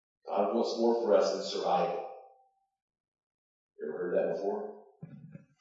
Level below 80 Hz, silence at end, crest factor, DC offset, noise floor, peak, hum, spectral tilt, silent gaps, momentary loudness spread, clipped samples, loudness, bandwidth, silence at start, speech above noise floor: under -90 dBFS; 0.25 s; 20 dB; under 0.1%; -68 dBFS; -14 dBFS; none; -5 dB/octave; 2.82-2.88 s, 3.00-3.12 s, 3.23-3.69 s; 23 LU; under 0.1%; -31 LUFS; 7.8 kHz; 0.25 s; 38 dB